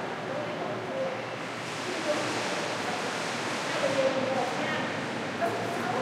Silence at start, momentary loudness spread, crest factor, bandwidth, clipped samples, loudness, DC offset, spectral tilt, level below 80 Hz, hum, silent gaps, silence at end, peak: 0 s; 6 LU; 16 dB; 16 kHz; under 0.1%; -30 LUFS; under 0.1%; -4 dB/octave; -74 dBFS; none; none; 0 s; -14 dBFS